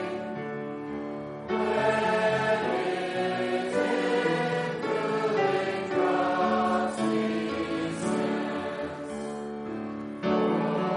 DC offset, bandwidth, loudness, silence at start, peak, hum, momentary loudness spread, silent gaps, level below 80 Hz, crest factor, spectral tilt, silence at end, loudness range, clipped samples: under 0.1%; 10.5 kHz; -28 LUFS; 0 s; -14 dBFS; none; 10 LU; none; -64 dBFS; 14 dB; -5.5 dB/octave; 0 s; 4 LU; under 0.1%